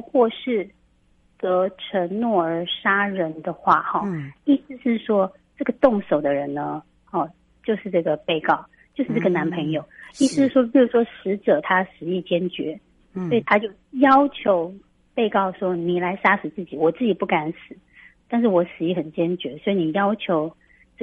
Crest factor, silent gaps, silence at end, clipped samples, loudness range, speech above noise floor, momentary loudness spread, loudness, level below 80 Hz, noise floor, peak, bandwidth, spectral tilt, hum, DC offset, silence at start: 20 dB; none; 0 s; under 0.1%; 3 LU; 39 dB; 11 LU; -22 LUFS; -60 dBFS; -60 dBFS; -2 dBFS; 11.5 kHz; -6 dB/octave; none; under 0.1%; 0.05 s